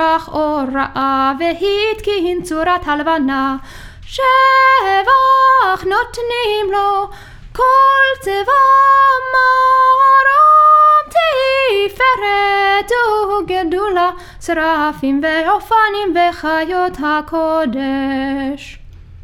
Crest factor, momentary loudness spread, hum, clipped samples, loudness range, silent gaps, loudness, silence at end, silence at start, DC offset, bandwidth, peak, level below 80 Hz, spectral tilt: 12 dB; 10 LU; none; under 0.1%; 7 LU; none; -13 LUFS; 0.05 s; 0 s; under 0.1%; 15.5 kHz; 0 dBFS; -40 dBFS; -4 dB/octave